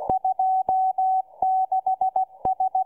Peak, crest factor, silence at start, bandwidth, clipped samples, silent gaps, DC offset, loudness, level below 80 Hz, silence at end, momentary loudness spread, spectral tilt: -8 dBFS; 16 dB; 0 s; 1.3 kHz; under 0.1%; none; under 0.1%; -23 LUFS; -56 dBFS; 0 s; 3 LU; -9 dB/octave